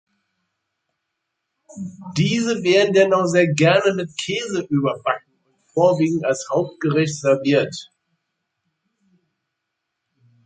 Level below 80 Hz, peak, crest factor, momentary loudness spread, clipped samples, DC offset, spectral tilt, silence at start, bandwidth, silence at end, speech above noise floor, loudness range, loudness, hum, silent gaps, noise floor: -64 dBFS; -2 dBFS; 18 dB; 12 LU; under 0.1%; under 0.1%; -5.5 dB/octave; 1.75 s; 9.4 kHz; 2.6 s; 60 dB; 6 LU; -19 LUFS; none; none; -79 dBFS